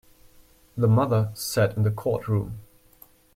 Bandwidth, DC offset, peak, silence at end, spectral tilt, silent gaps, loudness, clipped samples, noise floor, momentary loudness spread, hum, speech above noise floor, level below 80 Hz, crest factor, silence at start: 16.5 kHz; under 0.1%; -10 dBFS; 0.75 s; -6.5 dB/octave; none; -24 LUFS; under 0.1%; -55 dBFS; 15 LU; none; 32 dB; -54 dBFS; 16 dB; 0.75 s